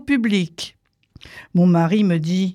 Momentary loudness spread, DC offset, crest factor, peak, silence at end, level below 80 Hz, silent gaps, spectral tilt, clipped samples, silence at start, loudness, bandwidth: 14 LU; under 0.1%; 14 dB; -6 dBFS; 0 s; -56 dBFS; none; -7 dB/octave; under 0.1%; 0.05 s; -18 LUFS; 10.5 kHz